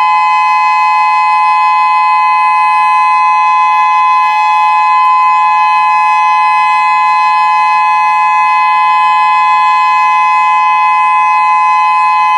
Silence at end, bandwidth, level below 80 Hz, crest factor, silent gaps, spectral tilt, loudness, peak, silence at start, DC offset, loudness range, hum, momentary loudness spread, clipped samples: 0 s; 11 kHz; -84 dBFS; 8 dB; none; 0.5 dB/octave; -8 LUFS; 0 dBFS; 0 s; under 0.1%; 0 LU; none; 1 LU; under 0.1%